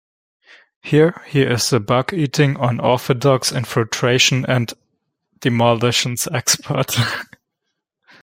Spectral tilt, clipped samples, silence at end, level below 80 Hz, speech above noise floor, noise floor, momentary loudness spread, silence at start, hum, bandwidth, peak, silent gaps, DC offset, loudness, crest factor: -4 dB/octave; under 0.1%; 1 s; -54 dBFS; 60 dB; -77 dBFS; 6 LU; 0.85 s; none; 16.5 kHz; 0 dBFS; none; under 0.1%; -17 LUFS; 18 dB